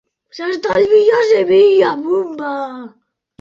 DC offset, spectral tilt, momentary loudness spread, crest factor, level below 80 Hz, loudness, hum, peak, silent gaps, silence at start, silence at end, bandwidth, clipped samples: under 0.1%; -5.5 dB/octave; 14 LU; 12 dB; -58 dBFS; -13 LUFS; none; -2 dBFS; none; 0.35 s; 0.5 s; 7.4 kHz; under 0.1%